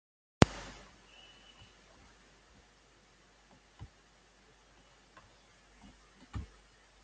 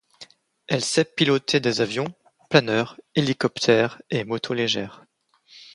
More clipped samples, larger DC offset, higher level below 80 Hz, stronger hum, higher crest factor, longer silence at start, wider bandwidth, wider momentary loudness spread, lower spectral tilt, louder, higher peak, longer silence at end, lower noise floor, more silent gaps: neither; neither; first, -52 dBFS vs -64 dBFS; neither; first, 40 dB vs 24 dB; first, 0.4 s vs 0.2 s; second, 9 kHz vs 11.5 kHz; first, 31 LU vs 8 LU; about the same, -5.5 dB/octave vs -4.5 dB/octave; second, -33 LUFS vs -23 LUFS; about the same, 0 dBFS vs 0 dBFS; first, 0.6 s vs 0.1 s; first, -64 dBFS vs -56 dBFS; neither